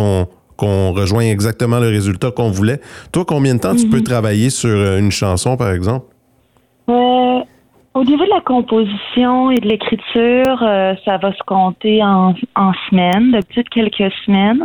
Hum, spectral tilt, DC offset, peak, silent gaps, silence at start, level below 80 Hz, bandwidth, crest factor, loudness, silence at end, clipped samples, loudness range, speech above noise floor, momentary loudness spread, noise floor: none; -6 dB/octave; under 0.1%; -4 dBFS; none; 0 s; -46 dBFS; 15.5 kHz; 10 dB; -14 LUFS; 0 s; under 0.1%; 2 LU; 42 dB; 6 LU; -55 dBFS